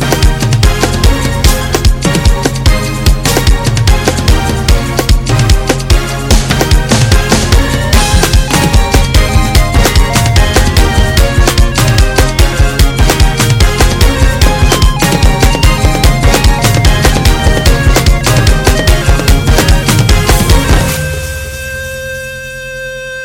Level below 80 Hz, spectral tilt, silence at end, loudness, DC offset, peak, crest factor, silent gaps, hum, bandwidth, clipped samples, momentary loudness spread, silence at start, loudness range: -10 dBFS; -4.5 dB/octave; 0 s; -9 LUFS; under 0.1%; 0 dBFS; 8 dB; none; none; 17.5 kHz; 4%; 3 LU; 0 s; 2 LU